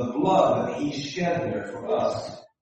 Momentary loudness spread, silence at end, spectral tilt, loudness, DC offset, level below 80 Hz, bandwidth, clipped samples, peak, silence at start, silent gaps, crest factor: 11 LU; 0.15 s; -6 dB/octave; -25 LUFS; under 0.1%; -60 dBFS; 8.4 kHz; under 0.1%; -8 dBFS; 0 s; none; 16 dB